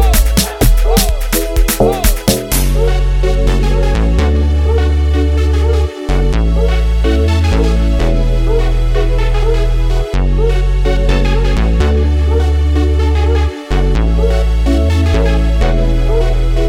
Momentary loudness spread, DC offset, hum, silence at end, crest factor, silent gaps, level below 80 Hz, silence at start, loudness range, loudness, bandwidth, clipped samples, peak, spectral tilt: 3 LU; under 0.1%; none; 0 s; 10 dB; none; -12 dBFS; 0 s; 1 LU; -14 LUFS; 16.5 kHz; under 0.1%; 0 dBFS; -5.5 dB/octave